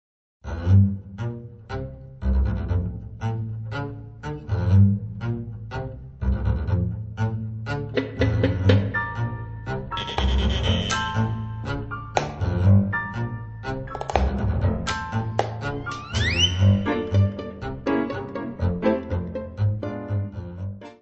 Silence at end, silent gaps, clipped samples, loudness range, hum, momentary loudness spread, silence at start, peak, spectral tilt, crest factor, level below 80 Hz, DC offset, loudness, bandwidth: 0.1 s; none; under 0.1%; 4 LU; none; 14 LU; 0.45 s; -2 dBFS; -6 dB/octave; 22 dB; -34 dBFS; under 0.1%; -25 LUFS; 8.2 kHz